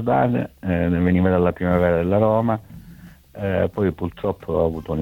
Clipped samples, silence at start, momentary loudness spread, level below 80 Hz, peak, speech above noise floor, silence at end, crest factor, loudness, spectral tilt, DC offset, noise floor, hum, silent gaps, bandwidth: under 0.1%; 0 s; 8 LU; -42 dBFS; -4 dBFS; 24 dB; 0 s; 16 dB; -21 LUFS; -9.5 dB/octave; under 0.1%; -44 dBFS; none; none; 16 kHz